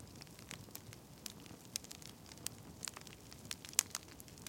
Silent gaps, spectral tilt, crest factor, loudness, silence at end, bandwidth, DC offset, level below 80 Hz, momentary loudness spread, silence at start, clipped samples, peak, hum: none; -1.5 dB/octave; 44 dB; -45 LUFS; 0 s; 17 kHz; under 0.1%; -70 dBFS; 18 LU; 0 s; under 0.1%; -4 dBFS; none